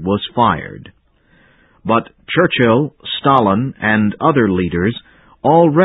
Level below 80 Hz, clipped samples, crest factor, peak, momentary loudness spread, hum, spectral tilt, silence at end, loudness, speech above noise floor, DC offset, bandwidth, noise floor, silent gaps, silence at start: -42 dBFS; under 0.1%; 16 dB; 0 dBFS; 9 LU; none; -10 dB/octave; 0 s; -15 LUFS; 39 dB; under 0.1%; 4 kHz; -53 dBFS; none; 0 s